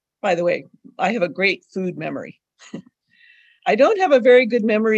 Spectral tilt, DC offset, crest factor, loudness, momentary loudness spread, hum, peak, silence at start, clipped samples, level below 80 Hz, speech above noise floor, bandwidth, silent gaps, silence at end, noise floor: -6 dB/octave; under 0.1%; 16 dB; -18 LUFS; 25 LU; none; -2 dBFS; 0.25 s; under 0.1%; -72 dBFS; 36 dB; 8 kHz; none; 0 s; -54 dBFS